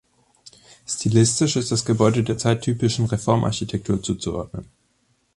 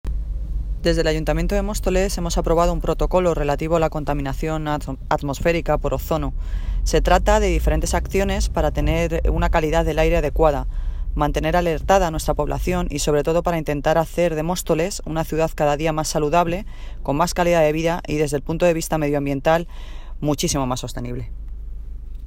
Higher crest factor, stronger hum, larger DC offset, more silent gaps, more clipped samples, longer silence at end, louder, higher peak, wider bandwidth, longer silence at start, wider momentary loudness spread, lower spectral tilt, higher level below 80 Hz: about the same, 20 dB vs 18 dB; neither; neither; neither; neither; first, 0.7 s vs 0 s; about the same, -21 LUFS vs -21 LUFS; about the same, -2 dBFS vs -2 dBFS; second, 11.5 kHz vs 16.5 kHz; first, 0.45 s vs 0.05 s; about the same, 12 LU vs 11 LU; about the same, -5.5 dB/octave vs -5.5 dB/octave; second, -46 dBFS vs -26 dBFS